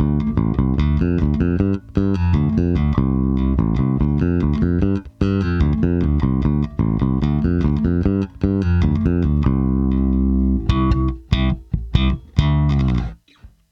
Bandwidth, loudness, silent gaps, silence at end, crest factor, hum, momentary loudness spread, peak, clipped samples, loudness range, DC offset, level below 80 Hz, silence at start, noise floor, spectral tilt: 6.6 kHz; -19 LUFS; none; 0.25 s; 16 dB; none; 3 LU; 0 dBFS; under 0.1%; 1 LU; under 0.1%; -24 dBFS; 0 s; -47 dBFS; -9.5 dB/octave